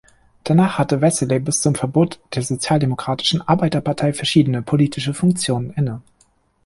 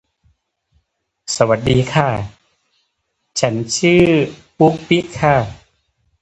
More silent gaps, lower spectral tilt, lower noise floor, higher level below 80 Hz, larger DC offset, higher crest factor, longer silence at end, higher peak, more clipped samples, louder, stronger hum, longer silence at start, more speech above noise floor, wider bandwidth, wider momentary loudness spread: neither; about the same, -5.5 dB/octave vs -5 dB/octave; second, -59 dBFS vs -71 dBFS; second, -50 dBFS vs -42 dBFS; neither; about the same, 16 dB vs 18 dB; about the same, 0.65 s vs 0.65 s; about the same, -2 dBFS vs 0 dBFS; neither; about the same, -18 LUFS vs -16 LUFS; neither; second, 0.45 s vs 1.3 s; second, 41 dB vs 56 dB; first, 11.5 kHz vs 9.2 kHz; second, 7 LU vs 13 LU